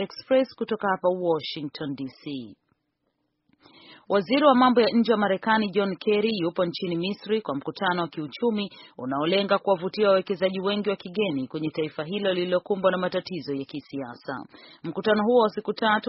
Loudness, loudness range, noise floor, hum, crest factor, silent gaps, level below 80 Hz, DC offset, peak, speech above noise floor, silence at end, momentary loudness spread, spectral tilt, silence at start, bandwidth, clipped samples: -25 LUFS; 6 LU; -76 dBFS; none; 20 dB; none; -70 dBFS; under 0.1%; -6 dBFS; 51 dB; 0 s; 14 LU; -3.5 dB/octave; 0 s; 6 kHz; under 0.1%